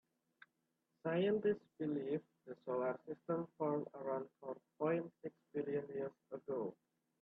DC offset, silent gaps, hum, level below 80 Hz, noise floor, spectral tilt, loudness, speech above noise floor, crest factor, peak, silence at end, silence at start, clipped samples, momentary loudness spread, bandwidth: under 0.1%; none; none; -86 dBFS; -86 dBFS; -9.5 dB/octave; -42 LUFS; 44 dB; 16 dB; -26 dBFS; 0.5 s; 1.05 s; under 0.1%; 13 LU; 4.1 kHz